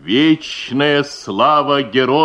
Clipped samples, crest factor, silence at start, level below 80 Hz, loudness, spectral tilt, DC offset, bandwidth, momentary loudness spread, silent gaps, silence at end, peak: under 0.1%; 14 dB; 0.05 s; -58 dBFS; -15 LUFS; -5 dB/octave; under 0.1%; 9.8 kHz; 6 LU; none; 0 s; 0 dBFS